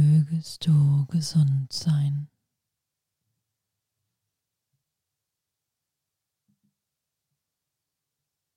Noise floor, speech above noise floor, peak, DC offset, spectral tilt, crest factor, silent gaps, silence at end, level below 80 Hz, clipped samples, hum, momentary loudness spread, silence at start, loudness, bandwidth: -85 dBFS; 62 dB; -12 dBFS; under 0.1%; -7 dB/octave; 16 dB; none; 6.3 s; -66 dBFS; under 0.1%; none; 9 LU; 0 s; -24 LUFS; 11.5 kHz